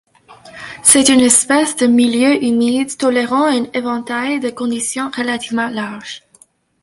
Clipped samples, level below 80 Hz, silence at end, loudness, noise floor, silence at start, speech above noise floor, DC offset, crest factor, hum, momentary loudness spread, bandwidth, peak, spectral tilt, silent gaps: under 0.1%; -54 dBFS; 0.65 s; -14 LUFS; -51 dBFS; 0.3 s; 36 dB; under 0.1%; 16 dB; none; 15 LU; 16 kHz; 0 dBFS; -2 dB/octave; none